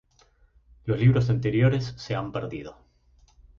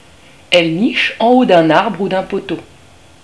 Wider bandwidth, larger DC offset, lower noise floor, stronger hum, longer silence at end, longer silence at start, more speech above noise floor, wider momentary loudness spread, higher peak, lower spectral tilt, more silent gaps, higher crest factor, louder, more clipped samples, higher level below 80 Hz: second, 7 kHz vs 11 kHz; second, under 0.1% vs 0.4%; first, -61 dBFS vs -44 dBFS; neither; first, 0.85 s vs 0.6 s; first, 0.85 s vs 0.5 s; first, 37 dB vs 31 dB; first, 17 LU vs 12 LU; second, -8 dBFS vs 0 dBFS; first, -8 dB/octave vs -5.5 dB/octave; neither; about the same, 18 dB vs 14 dB; second, -25 LUFS vs -13 LUFS; second, under 0.1% vs 0.2%; about the same, -50 dBFS vs -52 dBFS